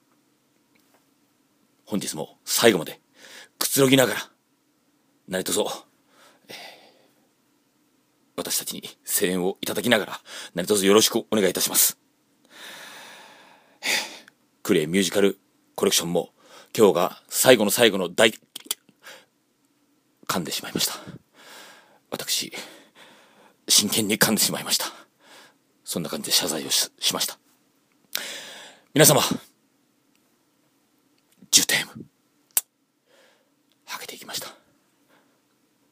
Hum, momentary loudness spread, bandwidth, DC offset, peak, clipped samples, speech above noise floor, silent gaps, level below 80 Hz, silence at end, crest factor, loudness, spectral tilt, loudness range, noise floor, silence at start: none; 23 LU; 15.5 kHz; under 0.1%; 0 dBFS; under 0.1%; 45 dB; none; -72 dBFS; 1.4 s; 26 dB; -22 LUFS; -2.5 dB/octave; 10 LU; -67 dBFS; 1.9 s